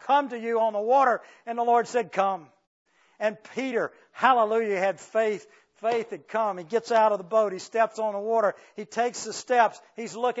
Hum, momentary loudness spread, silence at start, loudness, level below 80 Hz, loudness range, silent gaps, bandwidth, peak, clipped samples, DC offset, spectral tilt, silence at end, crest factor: none; 11 LU; 0 s; -26 LUFS; -84 dBFS; 1 LU; 2.67-2.85 s; 8 kHz; -6 dBFS; under 0.1%; under 0.1%; -3.5 dB/octave; 0 s; 20 dB